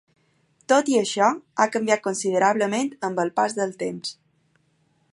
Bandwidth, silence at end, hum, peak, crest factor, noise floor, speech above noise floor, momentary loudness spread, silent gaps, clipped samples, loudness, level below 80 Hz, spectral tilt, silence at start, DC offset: 11.5 kHz; 1 s; none; -4 dBFS; 20 dB; -66 dBFS; 44 dB; 10 LU; none; under 0.1%; -23 LUFS; -76 dBFS; -3.5 dB/octave; 0.7 s; under 0.1%